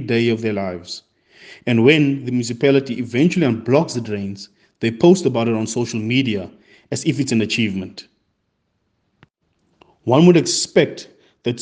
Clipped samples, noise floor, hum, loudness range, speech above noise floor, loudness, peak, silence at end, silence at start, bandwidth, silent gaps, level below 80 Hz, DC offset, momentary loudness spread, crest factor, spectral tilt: under 0.1%; -70 dBFS; none; 6 LU; 53 dB; -18 LUFS; 0 dBFS; 0 s; 0 s; 9.8 kHz; none; -62 dBFS; under 0.1%; 16 LU; 18 dB; -5.5 dB/octave